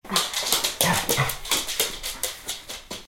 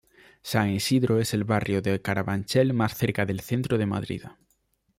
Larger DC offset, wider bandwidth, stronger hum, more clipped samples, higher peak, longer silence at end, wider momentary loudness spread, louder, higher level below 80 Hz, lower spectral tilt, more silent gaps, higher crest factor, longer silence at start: neither; about the same, 17 kHz vs 16 kHz; neither; neither; first, 0 dBFS vs -8 dBFS; second, 0 s vs 0.65 s; first, 12 LU vs 6 LU; about the same, -24 LUFS vs -26 LUFS; first, -46 dBFS vs -56 dBFS; second, -1.5 dB/octave vs -6 dB/octave; neither; first, 26 dB vs 18 dB; second, 0.05 s vs 0.45 s